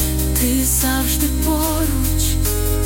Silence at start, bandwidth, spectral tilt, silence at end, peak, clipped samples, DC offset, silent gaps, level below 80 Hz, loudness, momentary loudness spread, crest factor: 0 s; 17 kHz; -4 dB/octave; 0 s; -4 dBFS; under 0.1%; under 0.1%; none; -22 dBFS; -17 LUFS; 3 LU; 12 dB